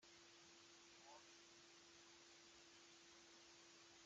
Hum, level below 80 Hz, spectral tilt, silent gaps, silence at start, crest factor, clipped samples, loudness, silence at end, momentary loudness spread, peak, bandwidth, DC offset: none; under -90 dBFS; -1 dB/octave; none; 0 s; 16 dB; under 0.1%; -65 LUFS; 0 s; 1 LU; -52 dBFS; 8.8 kHz; under 0.1%